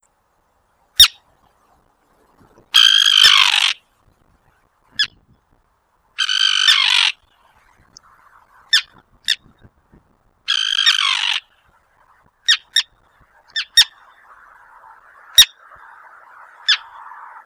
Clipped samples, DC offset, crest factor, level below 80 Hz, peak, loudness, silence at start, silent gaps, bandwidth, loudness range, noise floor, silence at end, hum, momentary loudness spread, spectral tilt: 0.2%; under 0.1%; 20 dB; -54 dBFS; 0 dBFS; -13 LUFS; 1 s; none; over 20 kHz; 6 LU; -63 dBFS; 0.65 s; none; 16 LU; 3.5 dB/octave